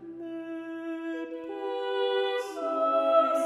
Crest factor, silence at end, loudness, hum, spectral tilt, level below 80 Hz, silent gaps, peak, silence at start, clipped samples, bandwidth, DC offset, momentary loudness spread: 18 dB; 0 s; -30 LUFS; none; -3 dB/octave; -78 dBFS; none; -12 dBFS; 0 s; under 0.1%; 13.5 kHz; under 0.1%; 14 LU